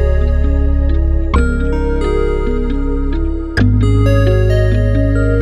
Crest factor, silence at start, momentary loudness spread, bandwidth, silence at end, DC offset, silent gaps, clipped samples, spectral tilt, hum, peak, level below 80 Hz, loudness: 12 dB; 0 s; 7 LU; 10 kHz; 0 s; under 0.1%; none; under 0.1%; -8.5 dB/octave; none; 0 dBFS; -14 dBFS; -15 LUFS